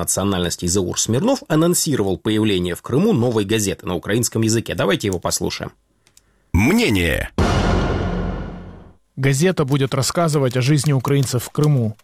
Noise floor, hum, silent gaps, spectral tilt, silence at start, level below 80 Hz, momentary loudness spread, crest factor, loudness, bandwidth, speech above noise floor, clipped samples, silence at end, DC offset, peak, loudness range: -56 dBFS; none; none; -5 dB/octave; 0 s; -34 dBFS; 7 LU; 16 dB; -19 LUFS; 16 kHz; 38 dB; under 0.1%; 0.1 s; under 0.1%; -4 dBFS; 2 LU